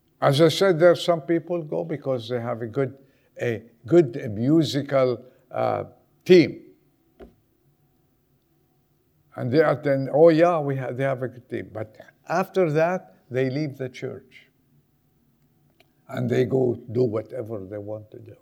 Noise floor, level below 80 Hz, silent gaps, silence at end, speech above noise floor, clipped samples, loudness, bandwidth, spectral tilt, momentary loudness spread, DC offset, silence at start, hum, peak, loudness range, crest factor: -65 dBFS; -68 dBFS; none; 0.1 s; 43 dB; under 0.1%; -23 LUFS; 15 kHz; -7 dB/octave; 17 LU; under 0.1%; 0.2 s; none; -2 dBFS; 7 LU; 20 dB